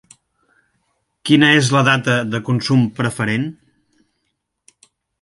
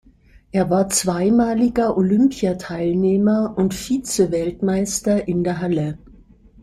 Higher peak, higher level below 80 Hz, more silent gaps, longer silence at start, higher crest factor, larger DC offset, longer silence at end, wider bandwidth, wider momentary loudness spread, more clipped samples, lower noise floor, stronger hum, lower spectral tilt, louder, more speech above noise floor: first, 0 dBFS vs -4 dBFS; second, -58 dBFS vs -46 dBFS; neither; first, 1.25 s vs 0.55 s; about the same, 18 dB vs 14 dB; neither; first, 1.7 s vs 0.65 s; second, 11.5 kHz vs 15 kHz; first, 10 LU vs 7 LU; neither; first, -72 dBFS vs -50 dBFS; neither; about the same, -5 dB/octave vs -5.5 dB/octave; first, -16 LUFS vs -19 LUFS; first, 57 dB vs 32 dB